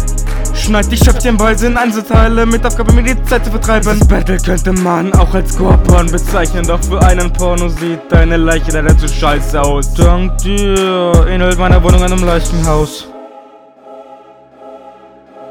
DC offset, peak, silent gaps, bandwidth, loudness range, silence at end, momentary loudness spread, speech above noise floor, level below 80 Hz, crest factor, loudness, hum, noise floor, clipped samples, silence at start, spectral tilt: 0.3%; 0 dBFS; none; 17.5 kHz; 2 LU; 0 s; 5 LU; 29 dB; -12 dBFS; 10 dB; -12 LUFS; none; -38 dBFS; 1%; 0 s; -5.5 dB/octave